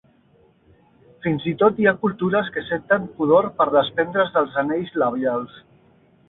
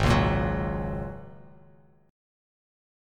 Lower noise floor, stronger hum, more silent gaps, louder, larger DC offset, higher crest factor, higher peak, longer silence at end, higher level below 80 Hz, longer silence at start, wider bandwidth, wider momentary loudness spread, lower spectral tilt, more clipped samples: about the same, -57 dBFS vs -57 dBFS; neither; neither; first, -21 LUFS vs -28 LUFS; neither; about the same, 18 dB vs 20 dB; first, -4 dBFS vs -10 dBFS; second, 0.7 s vs 1.75 s; second, -60 dBFS vs -38 dBFS; first, 1.25 s vs 0 s; second, 4.1 kHz vs 14.5 kHz; second, 8 LU vs 20 LU; first, -11 dB/octave vs -6.5 dB/octave; neither